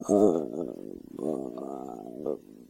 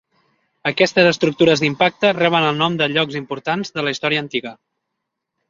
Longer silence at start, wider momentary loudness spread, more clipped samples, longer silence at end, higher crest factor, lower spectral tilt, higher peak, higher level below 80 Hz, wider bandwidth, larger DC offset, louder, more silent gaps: second, 0 s vs 0.65 s; first, 17 LU vs 10 LU; neither; second, 0.05 s vs 0.95 s; about the same, 20 dB vs 18 dB; first, -8 dB/octave vs -5 dB/octave; second, -10 dBFS vs -2 dBFS; second, -66 dBFS vs -60 dBFS; first, 15.5 kHz vs 7.6 kHz; neither; second, -31 LUFS vs -17 LUFS; neither